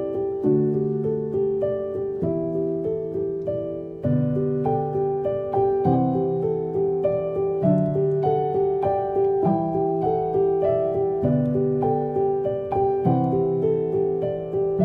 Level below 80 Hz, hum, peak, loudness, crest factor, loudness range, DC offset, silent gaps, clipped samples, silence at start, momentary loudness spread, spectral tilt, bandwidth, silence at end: -52 dBFS; none; -8 dBFS; -23 LUFS; 14 dB; 3 LU; under 0.1%; none; under 0.1%; 0 s; 5 LU; -12 dB/octave; 3.3 kHz; 0 s